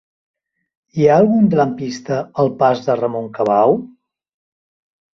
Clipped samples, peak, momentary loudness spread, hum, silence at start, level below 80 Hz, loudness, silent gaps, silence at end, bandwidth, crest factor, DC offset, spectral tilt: under 0.1%; 0 dBFS; 10 LU; none; 0.95 s; -58 dBFS; -16 LUFS; none; 1.25 s; 7.2 kHz; 16 dB; under 0.1%; -7.5 dB/octave